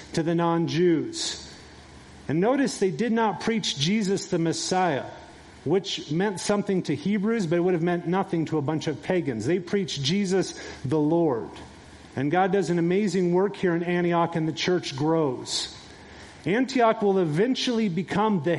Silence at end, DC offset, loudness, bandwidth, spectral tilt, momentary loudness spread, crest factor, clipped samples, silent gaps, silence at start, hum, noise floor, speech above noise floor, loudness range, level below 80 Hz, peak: 0 s; under 0.1%; -25 LUFS; 11.5 kHz; -5.5 dB/octave; 10 LU; 16 dB; under 0.1%; none; 0 s; none; -47 dBFS; 22 dB; 2 LU; -60 dBFS; -8 dBFS